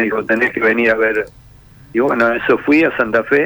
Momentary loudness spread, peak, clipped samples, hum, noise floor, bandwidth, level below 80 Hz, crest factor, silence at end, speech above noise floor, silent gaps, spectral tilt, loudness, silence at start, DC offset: 6 LU; -4 dBFS; under 0.1%; none; -42 dBFS; over 20 kHz; -48 dBFS; 12 dB; 0 s; 28 dB; none; -6.5 dB/octave; -15 LUFS; 0 s; under 0.1%